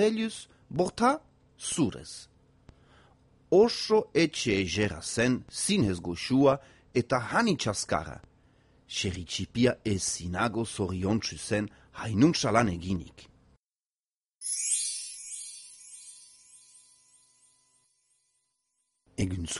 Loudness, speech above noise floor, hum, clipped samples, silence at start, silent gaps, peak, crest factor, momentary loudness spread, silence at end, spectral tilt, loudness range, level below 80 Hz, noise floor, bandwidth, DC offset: -28 LUFS; over 62 dB; none; under 0.1%; 0 s; 13.59-13.70 s, 13.86-13.90 s, 14.00-14.04 s, 14.13-14.21 s; -8 dBFS; 22 dB; 18 LU; 0 s; -4.5 dB/octave; 7 LU; -56 dBFS; under -90 dBFS; 11.5 kHz; under 0.1%